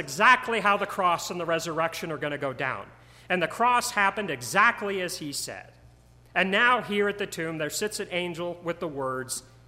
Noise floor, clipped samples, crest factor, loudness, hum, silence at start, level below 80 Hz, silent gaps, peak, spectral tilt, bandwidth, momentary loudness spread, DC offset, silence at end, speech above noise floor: -54 dBFS; under 0.1%; 22 dB; -26 LUFS; none; 0 s; -60 dBFS; none; -6 dBFS; -3 dB/octave; 16 kHz; 11 LU; under 0.1%; 0.25 s; 28 dB